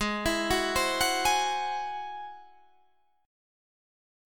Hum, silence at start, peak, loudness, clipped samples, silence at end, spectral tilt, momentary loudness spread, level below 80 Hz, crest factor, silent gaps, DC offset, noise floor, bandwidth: none; 0 s; -14 dBFS; -28 LUFS; under 0.1%; 1 s; -2 dB/octave; 14 LU; -50 dBFS; 18 dB; none; 0.3%; -69 dBFS; 19.5 kHz